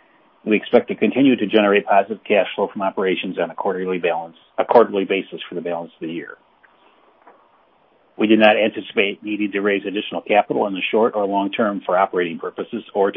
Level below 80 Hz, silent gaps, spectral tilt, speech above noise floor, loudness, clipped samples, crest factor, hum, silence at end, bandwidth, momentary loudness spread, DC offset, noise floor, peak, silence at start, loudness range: -68 dBFS; none; -10.5 dB/octave; 38 dB; -19 LUFS; under 0.1%; 20 dB; none; 0 s; 5.4 kHz; 13 LU; under 0.1%; -57 dBFS; 0 dBFS; 0.45 s; 4 LU